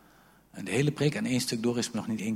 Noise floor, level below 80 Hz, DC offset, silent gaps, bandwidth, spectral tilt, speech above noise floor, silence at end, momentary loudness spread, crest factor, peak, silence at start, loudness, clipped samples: -59 dBFS; -64 dBFS; under 0.1%; none; 16 kHz; -5 dB/octave; 30 dB; 0 s; 8 LU; 18 dB; -12 dBFS; 0.55 s; -29 LUFS; under 0.1%